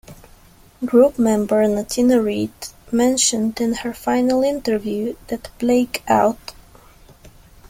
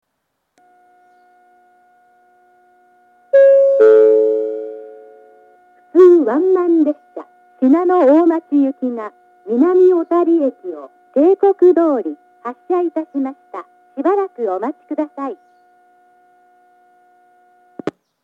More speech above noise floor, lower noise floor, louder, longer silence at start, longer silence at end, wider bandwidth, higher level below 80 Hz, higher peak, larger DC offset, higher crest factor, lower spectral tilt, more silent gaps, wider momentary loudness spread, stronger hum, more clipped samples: second, 30 dB vs 57 dB; second, -48 dBFS vs -72 dBFS; second, -18 LUFS vs -14 LUFS; second, 0.1 s vs 3.35 s; second, 0 s vs 0.35 s; first, 16.5 kHz vs 4.1 kHz; first, -48 dBFS vs -84 dBFS; about the same, -2 dBFS vs 0 dBFS; neither; about the same, 18 dB vs 16 dB; second, -4 dB/octave vs -7.5 dB/octave; neither; second, 12 LU vs 21 LU; neither; neither